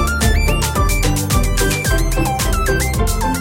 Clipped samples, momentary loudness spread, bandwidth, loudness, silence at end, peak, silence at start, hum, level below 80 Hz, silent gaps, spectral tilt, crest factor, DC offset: under 0.1%; 2 LU; 17 kHz; -17 LUFS; 0 s; -2 dBFS; 0 s; none; -18 dBFS; none; -4.5 dB/octave; 14 dB; under 0.1%